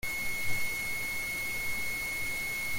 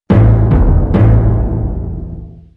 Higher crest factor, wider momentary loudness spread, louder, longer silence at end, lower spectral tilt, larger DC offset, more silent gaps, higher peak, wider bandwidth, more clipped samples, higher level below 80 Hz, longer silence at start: about the same, 14 dB vs 10 dB; second, 1 LU vs 16 LU; second, -32 LUFS vs -12 LUFS; second, 0 s vs 0.25 s; second, -1.5 dB/octave vs -11.5 dB/octave; neither; neither; second, -18 dBFS vs 0 dBFS; first, 17 kHz vs 3.7 kHz; neither; second, -50 dBFS vs -16 dBFS; about the same, 0.05 s vs 0.1 s